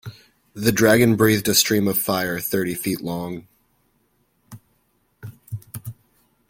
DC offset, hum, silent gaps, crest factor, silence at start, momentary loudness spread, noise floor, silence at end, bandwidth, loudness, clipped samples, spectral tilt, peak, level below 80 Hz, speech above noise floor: under 0.1%; none; none; 20 dB; 0.05 s; 24 LU; -66 dBFS; 0.55 s; 17 kHz; -19 LUFS; under 0.1%; -4 dB/octave; -2 dBFS; -54 dBFS; 46 dB